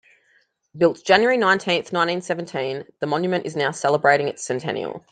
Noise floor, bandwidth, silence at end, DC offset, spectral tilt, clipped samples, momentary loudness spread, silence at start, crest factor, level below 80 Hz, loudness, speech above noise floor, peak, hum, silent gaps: -63 dBFS; 9.4 kHz; 0.1 s; under 0.1%; -4.5 dB/octave; under 0.1%; 10 LU; 0.75 s; 20 dB; -68 dBFS; -21 LUFS; 42 dB; -2 dBFS; none; none